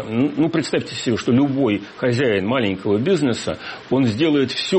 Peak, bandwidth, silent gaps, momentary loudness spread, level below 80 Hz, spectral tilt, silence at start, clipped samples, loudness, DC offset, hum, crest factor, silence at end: -6 dBFS; 8.8 kHz; none; 5 LU; -54 dBFS; -6 dB/octave; 0 s; under 0.1%; -19 LUFS; under 0.1%; none; 12 dB; 0 s